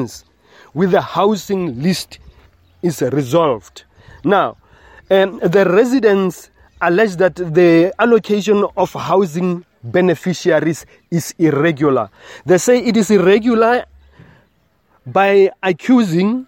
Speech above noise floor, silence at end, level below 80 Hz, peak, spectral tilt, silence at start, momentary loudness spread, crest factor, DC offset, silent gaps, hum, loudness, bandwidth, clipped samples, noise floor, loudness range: 44 dB; 0.05 s; -52 dBFS; 0 dBFS; -6 dB/octave; 0 s; 10 LU; 14 dB; under 0.1%; none; none; -15 LUFS; 16.5 kHz; under 0.1%; -58 dBFS; 5 LU